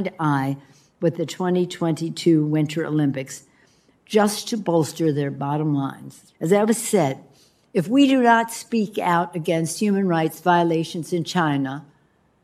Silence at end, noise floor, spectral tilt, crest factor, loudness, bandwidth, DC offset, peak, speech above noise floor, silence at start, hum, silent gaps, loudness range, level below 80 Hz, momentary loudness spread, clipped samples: 0.65 s; -61 dBFS; -5.5 dB/octave; 20 dB; -21 LUFS; 14.5 kHz; under 0.1%; -2 dBFS; 40 dB; 0 s; none; none; 3 LU; -68 dBFS; 9 LU; under 0.1%